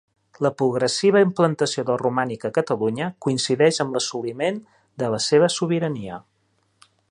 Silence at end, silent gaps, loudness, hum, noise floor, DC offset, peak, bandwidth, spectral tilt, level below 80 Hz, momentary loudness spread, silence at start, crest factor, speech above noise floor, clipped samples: 0.9 s; none; -22 LUFS; none; -67 dBFS; under 0.1%; -4 dBFS; 11 kHz; -4.5 dB/octave; -64 dBFS; 9 LU; 0.4 s; 18 dB; 46 dB; under 0.1%